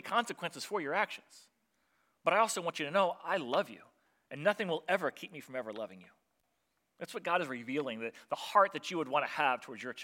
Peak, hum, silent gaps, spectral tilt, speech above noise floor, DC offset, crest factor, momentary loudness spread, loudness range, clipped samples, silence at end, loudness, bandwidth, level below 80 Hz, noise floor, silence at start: -12 dBFS; none; none; -3.5 dB/octave; 46 dB; under 0.1%; 22 dB; 14 LU; 5 LU; under 0.1%; 0 s; -34 LUFS; 16.5 kHz; under -90 dBFS; -80 dBFS; 0.05 s